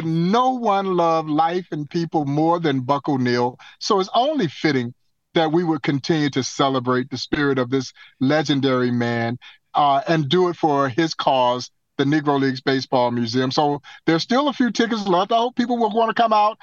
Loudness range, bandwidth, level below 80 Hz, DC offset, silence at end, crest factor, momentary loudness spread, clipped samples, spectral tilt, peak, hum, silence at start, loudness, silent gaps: 2 LU; 7.6 kHz; -60 dBFS; under 0.1%; 0.1 s; 18 dB; 6 LU; under 0.1%; -5.5 dB/octave; -2 dBFS; none; 0 s; -20 LUFS; none